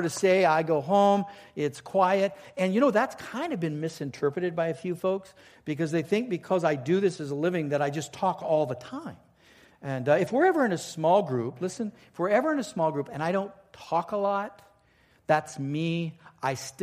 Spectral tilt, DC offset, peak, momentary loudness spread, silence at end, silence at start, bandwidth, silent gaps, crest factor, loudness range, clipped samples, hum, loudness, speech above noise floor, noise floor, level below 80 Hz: -6 dB/octave; under 0.1%; -8 dBFS; 11 LU; 0 s; 0 s; 15.5 kHz; none; 18 dB; 4 LU; under 0.1%; none; -27 LUFS; 36 dB; -63 dBFS; -70 dBFS